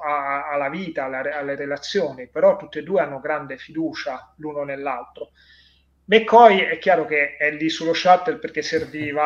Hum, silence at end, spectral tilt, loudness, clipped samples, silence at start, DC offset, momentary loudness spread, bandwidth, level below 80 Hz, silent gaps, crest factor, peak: none; 0 s; -4.5 dB/octave; -20 LUFS; under 0.1%; 0 s; under 0.1%; 15 LU; 7.4 kHz; -62 dBFS; none; 20 dB; 0 dBFS